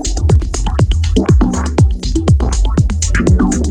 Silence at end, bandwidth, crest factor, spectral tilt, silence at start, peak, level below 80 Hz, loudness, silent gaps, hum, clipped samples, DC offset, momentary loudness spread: 0 s; 10.5 kHz; 10 dB; -6 dB/octave; 0 s; 0 dBFS; -16 dBFS; -14 LUFS; none; none; under 0.1%; under 0.1%; 3 LU